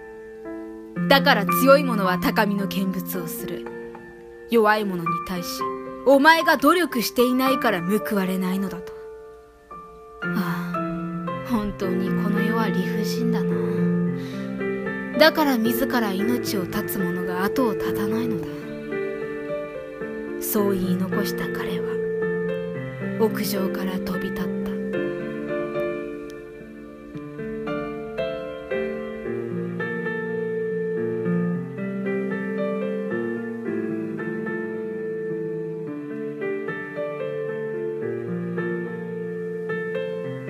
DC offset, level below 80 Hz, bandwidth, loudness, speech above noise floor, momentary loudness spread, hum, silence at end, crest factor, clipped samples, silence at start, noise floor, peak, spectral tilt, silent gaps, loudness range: under 0.1%; -54 dBFS; 15.5 kHz; -24 LUFS; 24 dB; 14 LU; none; 0 s; 22 dB; under 0.1%; 0 s; -45 dBFS; -2 dBFS; -5.5 dB/octave; none; 9 LU